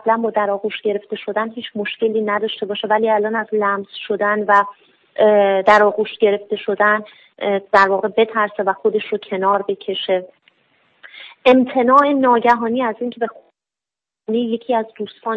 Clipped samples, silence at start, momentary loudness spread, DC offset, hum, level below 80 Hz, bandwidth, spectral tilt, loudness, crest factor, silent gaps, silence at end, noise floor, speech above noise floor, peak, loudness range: under 0.1%; 0.05 s; 12 LU; under 0.1%; none; -66 dBFS; 8 kHz; -6 dB/octave; -17 LUFS; 18 dB; none; 0 s; -88 dBFS; 71 dB; 0 dBFS; 4 LU